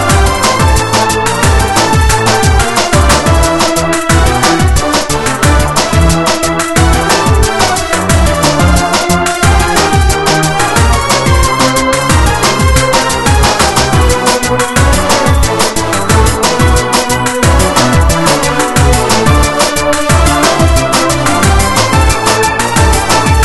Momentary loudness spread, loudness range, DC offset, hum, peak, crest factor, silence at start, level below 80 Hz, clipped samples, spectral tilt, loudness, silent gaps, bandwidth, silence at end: 2 LU; 1 LU; under 0.1%; none; 0 dBFS; 8 dB; 0 s; -16 dBFS; 0.5%; -4 dB/octave; -9 LUFS; none; 12.5 kHz; 0 s